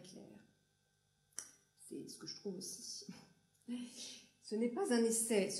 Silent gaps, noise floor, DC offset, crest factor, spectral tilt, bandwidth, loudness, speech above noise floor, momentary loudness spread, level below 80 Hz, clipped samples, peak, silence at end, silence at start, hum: none; -79 dBFS; under 0.1%; 20 dB; -3.5 dB/octave; 15.5 kHz; -41 LUFS; 39 dB; 24 LU; -90 dBFS; under 0.1%; -22 dBFS; 0 s; 0 s; 50 Hz at -75 dBFS